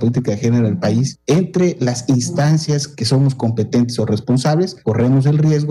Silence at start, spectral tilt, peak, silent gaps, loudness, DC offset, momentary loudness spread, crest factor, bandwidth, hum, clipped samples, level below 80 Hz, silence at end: 0 s; -6.5 dB/octave; -6 dBFS; none; -16 LUFS; under 0.1%; 5 LU; 10 dB; 12 kHz; none; under 0.1%; -52 dBFS; 0 s